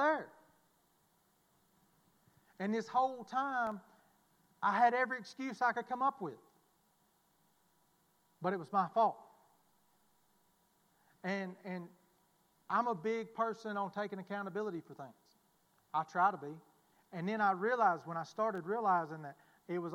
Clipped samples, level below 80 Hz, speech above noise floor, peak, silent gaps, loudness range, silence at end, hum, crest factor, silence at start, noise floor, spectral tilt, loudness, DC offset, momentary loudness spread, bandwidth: under 0.1%; -90 dBFS; 38 dB; -16 dBFS; none; 6 LU; 0 s; none; 22 dB; 0 s; -74 dBFS; -6 dB/octave; -36 LUFS; under 0.1%; 15 LU; 16 kHz